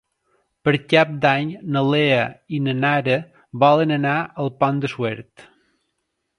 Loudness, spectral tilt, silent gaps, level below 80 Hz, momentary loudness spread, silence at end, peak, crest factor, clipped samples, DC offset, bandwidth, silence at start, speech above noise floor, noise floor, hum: -20 LUFS; -7 dB/octave; none; -62 dBFS; 10 LU; 1.15 s; 0 dBFS; 20 dB; under 0.1%; under 0.1%; 10.5 kHz; 0.65 s; 56 dB; -75 dBFS; none